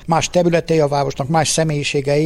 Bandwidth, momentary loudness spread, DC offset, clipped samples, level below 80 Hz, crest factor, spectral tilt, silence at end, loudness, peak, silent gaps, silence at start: 14 kHz; 3 LU; under 0.1%; under 0.1%; -42 dBFS; 14 dB; -4.5 dB/octave; 0 s; -17 LUFS; -2 dBFS; none; 0 s